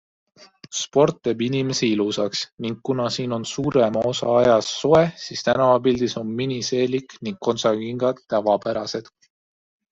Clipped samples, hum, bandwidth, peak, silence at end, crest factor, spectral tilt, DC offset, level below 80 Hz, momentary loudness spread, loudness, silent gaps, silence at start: under 0.1%; none; 8 kHz; -4 dBFS; 0.9 s; 18 dB; -5 dB/octave; under 0.1%; -58 dBFS; 9 LU; -21 LUFS; 2.52-2.58 s; 0.4 s